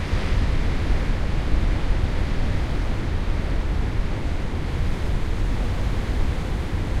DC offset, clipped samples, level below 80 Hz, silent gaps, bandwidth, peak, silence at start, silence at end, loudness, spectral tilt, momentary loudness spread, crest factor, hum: under 0.1%; under 0.1%; -24 dBFS; none; 11 kHz; -6 dBFS; 0 s; 0 s; -26 LUFS; -6.5 dB/octave; 3 LU; 14 dB; none